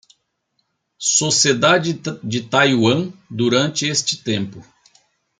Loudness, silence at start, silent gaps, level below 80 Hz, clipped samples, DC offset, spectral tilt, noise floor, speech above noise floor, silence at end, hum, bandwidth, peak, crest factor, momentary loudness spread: -17 LUFS; 1 s; none; -62 dBFS; under 0.1%; under 0.1%; -3 dB/octave; -70 dBFS; 52 dB; 0.8 s; none; 10 kHz; -2 dBFS; 18 dB; 11 LU